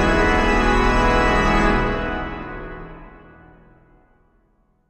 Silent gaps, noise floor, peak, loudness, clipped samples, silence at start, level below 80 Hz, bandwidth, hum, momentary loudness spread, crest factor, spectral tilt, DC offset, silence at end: none; -61 dBFS; -4 dBFS; -18 LUFS; under 0.1%; 0 s; -26 dBFS; 10.5 kHz; none; 17 LU; 16 dB; -5.5 dB/octave; under 0.1%; 1.7 s